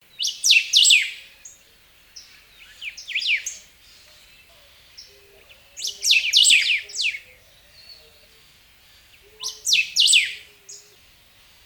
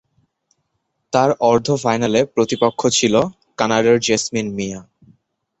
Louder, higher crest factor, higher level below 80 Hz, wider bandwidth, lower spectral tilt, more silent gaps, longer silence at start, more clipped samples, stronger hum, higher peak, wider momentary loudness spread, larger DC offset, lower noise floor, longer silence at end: about the same, -17 LUFS vs -17 LUFS; about the same, 22 dB vs 18 dB; second, -64 dBFS vs -54 dBFS; first, over 20 kHz vs 8.2 kHz; second, 5 dB/octave vs -4 dB/octave; neither; second, 0.2 s vs 1.15 s; neither; neither; about the same, -2 dBFS vs -2 dBFS; first, 22 LU vs 10 LU; neither; second, -54 dBFS vs -72 dBFS; about the same, 0.9 s vs 0.8 s